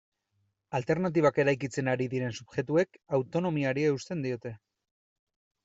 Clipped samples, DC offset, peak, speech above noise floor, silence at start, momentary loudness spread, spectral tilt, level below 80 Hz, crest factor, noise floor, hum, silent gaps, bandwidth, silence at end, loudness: under 0.1%; under 0.1%; -12 dBFS; 48 dB; 0.7 s; 10 LU; -6.5 dB/octave; -68 dBFS; 18 dB; -77 dBFS; none; none; 8 kHz; 1.1 s; -30 LUFS